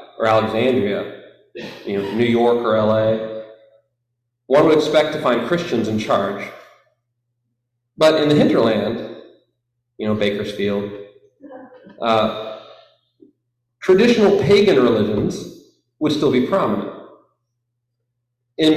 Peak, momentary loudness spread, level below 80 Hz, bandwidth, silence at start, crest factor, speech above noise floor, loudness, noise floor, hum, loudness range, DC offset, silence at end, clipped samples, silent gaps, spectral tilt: -4 dBFS; 18 LU; -54 dBFS; 14 kHz; 0 s; 16 dB; 58 dB; -17 LUFS; -75 dBFS; none; 6 LU; under 0.1%; 0 s; under 0.1%; none; -6 dB/octave